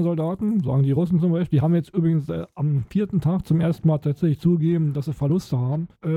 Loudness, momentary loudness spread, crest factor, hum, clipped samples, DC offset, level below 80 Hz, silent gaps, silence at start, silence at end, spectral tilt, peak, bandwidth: -22 LUFS; 5 LU; 12 dB; none; under 0.1%; under 0.1%; -50 dBFS; none; 0 s; 0 s; -10 dB/octave; -8 dBFS; 7.8 kHz